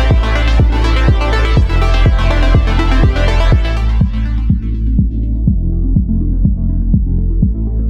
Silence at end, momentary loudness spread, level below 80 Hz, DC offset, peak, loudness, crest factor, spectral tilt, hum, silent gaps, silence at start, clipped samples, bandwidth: 0 s; 4 LU; -12 dBFS; under 0.1%; 0 dBFS; -14 LUFS; 10 dB; -7.5 dB/octave; none; none; 0 s; under 0.1%; 7.4 kHz